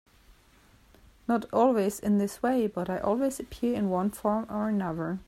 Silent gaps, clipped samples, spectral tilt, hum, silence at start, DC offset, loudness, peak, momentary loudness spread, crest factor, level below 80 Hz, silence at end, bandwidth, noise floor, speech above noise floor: none; under 0.1%; -6.5 dB/octave; none; 1.3 s; under 0.1%; -28 LUFS; -10 dBFS; 6 LU; 18 dB; -56 dBFS; 0.05 s; 15 kHz; -59 dBFS; 32 dB